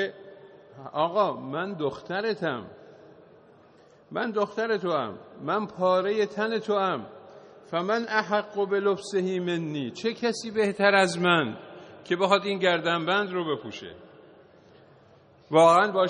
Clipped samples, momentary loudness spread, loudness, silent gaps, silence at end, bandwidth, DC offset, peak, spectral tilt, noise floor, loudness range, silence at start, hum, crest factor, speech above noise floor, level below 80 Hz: under 0.1%; 15 LU; -26 LUFS; none; 0 s; 9.4 kHz; under 0.1%; -6 dBFS; -5 dB/octave; -56 dBFS; 7 LU; 0 s; none; 20 dB; 30 dB; -72 dBFS